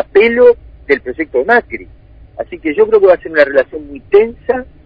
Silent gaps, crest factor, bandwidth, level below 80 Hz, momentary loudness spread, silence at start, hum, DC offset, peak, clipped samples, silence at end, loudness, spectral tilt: none; 12 dB; 5.2 kHz; -42 dBFS; 17 LU; 0 s; none; under 0.1%; 0 dBFS; 0.3%; 0.25 s; -12 LUFS; -7 dB/octave